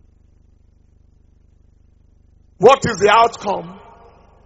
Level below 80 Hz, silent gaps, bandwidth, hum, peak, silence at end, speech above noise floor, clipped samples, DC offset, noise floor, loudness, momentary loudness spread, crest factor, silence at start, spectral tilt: -50 dBFS; none; 8 kHz; 50 Hz at -50 dBFS; 0 dBFS; 0.75 s; 38 dB; under 0.1%; under 0.1%; -52 dBFS; -14 LUFS; 13 LU; 20 dB; 2.6 s; -2.5 dB/octave